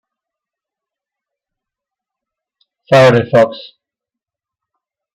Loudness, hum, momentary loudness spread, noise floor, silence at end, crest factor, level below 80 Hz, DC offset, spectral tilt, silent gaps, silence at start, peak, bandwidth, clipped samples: -10 LUFS; none; 9 LU; -85 dBFS; 1.55 s; 18 dB; -56 dBFS; under 0.1%; -6.5 dB/octave; none; 2.9 s; 0 dBFS; 12.5 kHz; under 0.1%